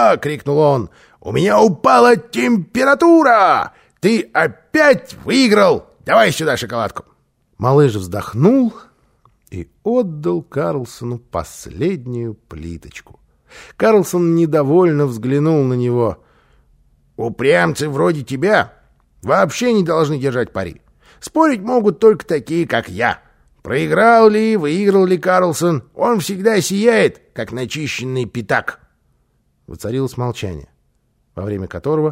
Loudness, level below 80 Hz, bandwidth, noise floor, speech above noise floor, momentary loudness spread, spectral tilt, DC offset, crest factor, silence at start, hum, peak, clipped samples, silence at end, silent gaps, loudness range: -15 LUFS; -48 dBFS; 16 kHz; -62 dBFS; 47 dB; 15 LU; -6 dB/octave; under 0.1%; 16 dB; 0 s; none; 0 dBFS; under 0.1%; 0 s; none; 10 LU